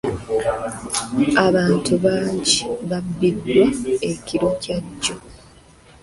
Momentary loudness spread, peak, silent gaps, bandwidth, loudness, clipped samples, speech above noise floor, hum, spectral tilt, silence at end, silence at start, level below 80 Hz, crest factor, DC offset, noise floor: 9 LU; -2 dBFS; none; 11.5 kHz; -20 LUFS; under 0.1%; 28 dB; none; -4.5 dB/octave; 0.65 s; 0.05 s; -46 dBFS; 18 dB; under 0.1%; -48 dBFS